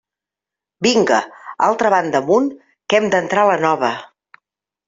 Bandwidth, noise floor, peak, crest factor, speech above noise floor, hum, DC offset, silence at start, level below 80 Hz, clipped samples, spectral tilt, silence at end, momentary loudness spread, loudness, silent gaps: 7.8 kHz; -87 dBFS; -2 dBFS; 16 dB; 71 dB; none; under 0.1%; 0.8 s; -62 dBFS; under 0.1%; -4 dB/octave; 0.85 s; 9 LU; -16 LUFS; none